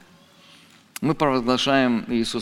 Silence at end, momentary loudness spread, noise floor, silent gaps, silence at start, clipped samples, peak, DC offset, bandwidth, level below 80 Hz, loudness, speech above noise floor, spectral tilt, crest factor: 0 s; 8 LU; -52 dBFS; none; 1 s; under 0.1%; -4 dBFS; under 0.1%; 15.5 kHz; -52 dBFS; -21 LUFS; 31 dB; -5 dB/octave; 18 dB